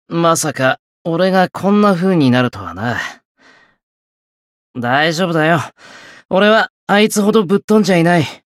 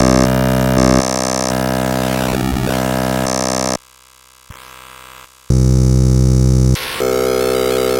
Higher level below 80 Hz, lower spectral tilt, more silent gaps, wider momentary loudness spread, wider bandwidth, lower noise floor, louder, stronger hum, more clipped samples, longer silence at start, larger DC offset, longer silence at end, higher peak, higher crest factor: second, -58 dBFS vs -24 dBFS; about the same, -5 dB/octave vs -5.5 dB/octave; first, 0.79-1.05 s, 3.25-3.35 s, 3.83-4.74 s, 6.25-6.29 s, 6.70-6.87 s, 7.64-7.68 s vs none; first, 10 LU vs 6 LU; second, 15 kHz vs 17 kHz; first, under -90 dBFS vs -46 dBFS; about the same, -14 LUFS vs -15 LUFS; neither; neither; about the same, 0.1 s vs 0 s; neither; first, 0.2 s vs 0 s; about the same, -2 dBFS vs 0 dBFS; about the same, 14 dB vs 14 dB